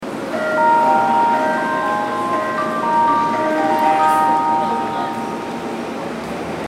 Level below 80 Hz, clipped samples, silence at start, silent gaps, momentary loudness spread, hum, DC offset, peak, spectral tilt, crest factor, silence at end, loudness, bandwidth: -56 dBFS; under 0.1%; 0 s; none; 11 LU; none; under 0.1%; -4 dBFS; -5 dB/octave; 14 dB; 0 s; -17 LUFS; 15.5 kHz